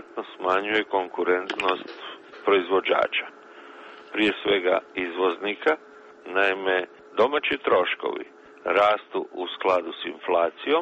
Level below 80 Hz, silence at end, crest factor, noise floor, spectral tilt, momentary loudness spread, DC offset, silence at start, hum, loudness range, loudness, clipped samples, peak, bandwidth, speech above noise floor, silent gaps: -66 dBFS; 0 s; 18 dB; -45 dBFS; -4.5 dB/octave; 15 LU; under 0.1%; 0 s; none; 2 LU; -24 LUFS; under 0.1%; -6 dBFS; 8.4 kHz; 21 dB; none